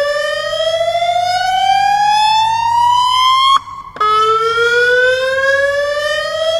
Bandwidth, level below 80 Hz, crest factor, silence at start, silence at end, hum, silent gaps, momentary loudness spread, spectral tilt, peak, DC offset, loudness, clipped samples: 16 kHz; -48 dBFS; 12 dB; 0 s; 0 s; none; none; 6 LU; -0.5 dB/octave; 0 dBFS; under 0.1%; -12 LUFS; under 0.1%